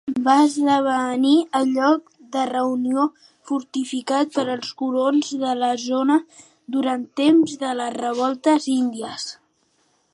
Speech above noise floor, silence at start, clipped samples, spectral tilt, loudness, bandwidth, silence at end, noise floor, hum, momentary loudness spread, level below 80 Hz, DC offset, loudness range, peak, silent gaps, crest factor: 45 dB; 0.05 s; under 0.1%; -3.5 dB/octave; -21 LUFS; 11.5 kHz; 0.8 s; -65 dBFS; none; 9 LU; -72 dBFS; under 0.1%; 3 LU; -2 dBFS; none; 18 dB